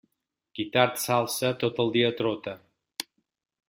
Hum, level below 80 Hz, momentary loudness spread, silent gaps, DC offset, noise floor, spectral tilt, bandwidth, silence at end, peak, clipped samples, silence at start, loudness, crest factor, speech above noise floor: none; -68 dBFS; 16 LU; none; under 0.1%; -82 dBFS; -4 dB/octave; 16.5 kHz; 0.65 s; -6 dBFS; under 0.1%; 0.55 s; -26 LUFS; 24 dB; 56 dB